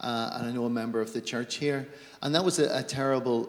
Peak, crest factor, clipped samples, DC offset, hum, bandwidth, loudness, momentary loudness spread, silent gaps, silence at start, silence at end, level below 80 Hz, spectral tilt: -10 dBFS; 20 dB; under 0.1%; under 0.1%; none; 18.5 kHz; -29 LUFS; 7 LU; none; 0 s; 0 s; -72 dBFS; -4.5 dB/octave